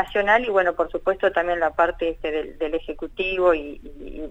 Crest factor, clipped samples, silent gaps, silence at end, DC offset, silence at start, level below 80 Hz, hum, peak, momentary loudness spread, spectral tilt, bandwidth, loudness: 16 dB; under 0.1%; none; 0 s; under 0.1%; 0 s; -42 dBFS; none; -6 dBFS; 14 LU; -5.5 dB/octave; 8.2 kHz; -22 LUFS